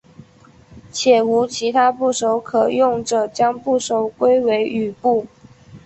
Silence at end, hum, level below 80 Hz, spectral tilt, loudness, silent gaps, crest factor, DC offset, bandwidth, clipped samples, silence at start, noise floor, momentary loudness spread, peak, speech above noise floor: 0.05 s; none; -58 dBFS; -4 dB/octave; -18 LUFS; none; 16 dB; under 0.1%; 8.4 kHz; under 0.1%; 0.7 s; -48 dBFS; 6 LU; -2 dBFS; 31 dB